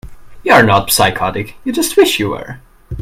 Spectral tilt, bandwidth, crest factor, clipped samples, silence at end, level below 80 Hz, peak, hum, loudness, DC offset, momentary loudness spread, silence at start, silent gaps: -3.5 dB/octave; 16.5 kHz; 14 dB; 0.1%; 0 s; -38 dBFS; 0 dBFS; none; -12 LUFS; under 0.1%; 16 LU; 0.05 s; none